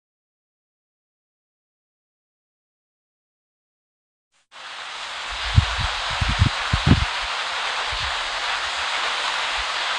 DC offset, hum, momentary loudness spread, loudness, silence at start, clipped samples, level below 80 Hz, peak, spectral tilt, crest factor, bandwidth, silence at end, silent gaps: under 0.1%; none; 11 LU; -22 LUFS; 4.55 s; under 0.1%; -36 dBFS; 0 dBFS; -4 dB/octave; 26 dB; 11 kHz; 0 s; none